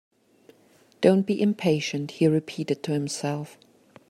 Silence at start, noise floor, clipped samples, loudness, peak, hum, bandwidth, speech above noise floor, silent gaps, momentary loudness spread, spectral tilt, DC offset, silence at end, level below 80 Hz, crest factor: 1 s; -59 dBFS; under 0.1%; -25 LUFS; -6 dBFS; none; 13 kHz; 35 dB; none; 9 LU; -6 dB/octave; under 0.1%; 0.6 s; -68 dBFS; 20 dB